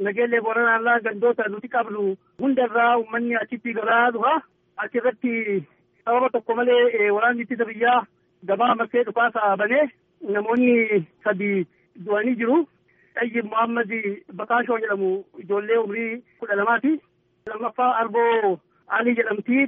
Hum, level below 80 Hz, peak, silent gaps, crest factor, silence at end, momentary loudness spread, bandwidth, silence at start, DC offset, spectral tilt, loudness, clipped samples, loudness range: none; -76 dBFS; -8 dBFS; none; 14 dB; 0 s; 10 LU; 3.8 kHz; 0 s; under 0.1%; -3 dB/octave; -22 LUFS; under 0.1%; 3 LU